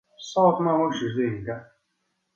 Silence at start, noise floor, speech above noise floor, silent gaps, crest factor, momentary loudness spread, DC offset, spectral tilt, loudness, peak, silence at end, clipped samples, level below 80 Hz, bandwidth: 0.2 s; -75 dBFS; 52 dB; none; 20 dB; 14 LU; under 0.1%; -6.5 dB/octave; -24 LUFS; -6 dBFS; 0.7 s; under 0.1%; -60 dBFS; 7.8 kHz